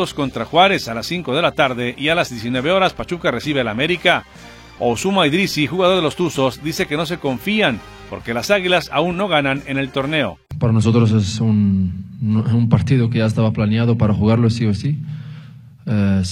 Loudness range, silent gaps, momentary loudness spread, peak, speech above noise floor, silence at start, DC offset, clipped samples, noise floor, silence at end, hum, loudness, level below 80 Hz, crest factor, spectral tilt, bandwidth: 2 LU; none; 8 LU; 0 dBFS; 21 dB; 0 s; under 0.1%; under 0.1%; -39 dBFS; 0 s; none; -17 LUFS; -44 dBFS; 16 dB; -6 dB/octave; 16 kHz